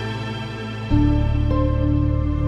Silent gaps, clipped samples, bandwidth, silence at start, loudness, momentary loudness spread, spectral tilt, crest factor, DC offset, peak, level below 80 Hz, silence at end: none; under 0.1%; 7 kHz; 0 s; -21 LUFS; 10 LU; -8.5 dB/octave; 12 dB; under 0.1%; -6 dBFS; -24 dBFS; 0 s